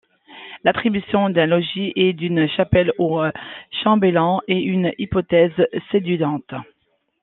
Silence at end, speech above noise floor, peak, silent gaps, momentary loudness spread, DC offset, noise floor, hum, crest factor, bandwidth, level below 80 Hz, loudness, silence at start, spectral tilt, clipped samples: 0.6 s; 49 dB; 0 dBFS; none; 10 LU; under 0.1%; -68 dBFS; none; 20 dB; 4.2 kHz; -48 dBFS; -19 LUFS; 0.3 s; -10 dB/octave; under 0.1%